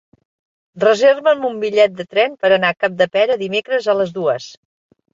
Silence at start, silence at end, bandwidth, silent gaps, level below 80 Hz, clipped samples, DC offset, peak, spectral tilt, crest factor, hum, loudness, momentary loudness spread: 0.75 s; 0.65 s; 7.8 kHz; none; -64 dBFS; under 0.1%; under 0.1%; -2 dBFS; -4.5 dB/octave; 16 dB; none; -16 LUFS; 7 LU